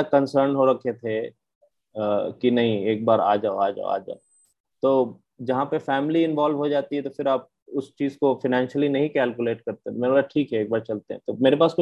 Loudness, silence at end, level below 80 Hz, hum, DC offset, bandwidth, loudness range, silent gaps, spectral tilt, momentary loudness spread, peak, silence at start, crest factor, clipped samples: -23 LUFS; 0 s; -68 dBFS; none; under 0.1%; 8.8 kHz; 1 LU; 1.55-1.61 s, 4.60-4.64 s, 7.62-7.66 s; -7.5 dB/octave; 11 LU; -4 dBFS; 0 s; 18 dB; under 0.1%